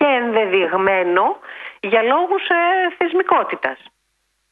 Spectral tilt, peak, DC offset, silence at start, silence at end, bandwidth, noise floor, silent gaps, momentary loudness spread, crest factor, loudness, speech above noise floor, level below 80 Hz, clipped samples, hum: -6.5 dB/octave; 0 dBFS; under 0.1%; 0 s; 0.75 s; 4.5 kHz; -68 dBFS; none; 10 LU; 18 dB; -17 LUFS; 51 dB; -64 dBFS; under 0.1%; none